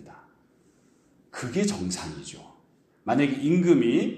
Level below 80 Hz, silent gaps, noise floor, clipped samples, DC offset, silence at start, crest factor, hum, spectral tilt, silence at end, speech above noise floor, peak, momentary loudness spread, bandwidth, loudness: -62 dBFS; none; -62 dBFS; under 0.1%; under 0.1%; 0 s; 18 dB; none; -6 dB/octave; 0 s; 38 dB; -8 dBFS; 21 LU; 12 kHz; -25 LUFS